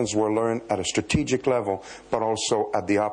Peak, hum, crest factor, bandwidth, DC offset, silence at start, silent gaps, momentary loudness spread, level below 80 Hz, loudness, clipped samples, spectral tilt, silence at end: -10 dBFS; none; 14 dB; 10.5 kHz; under 0.1%; 0 s; none; 5 LU; -50 dBFS; -25 LUFS; under 0.1%; -4.5 dB/octave; 0 s